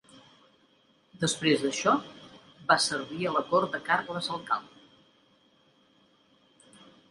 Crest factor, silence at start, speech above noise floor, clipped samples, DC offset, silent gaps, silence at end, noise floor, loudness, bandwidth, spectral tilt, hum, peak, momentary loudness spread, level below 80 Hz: 26 dB; 0.15 s; 37 dB; under 0.1%; under 0.1%; none; 2.45 s; -65 dBFS; -28 LUFS; 11.5 kHz; -3.5 dB/octave; none; -6 dBFS; 9 LU; -72 dBFS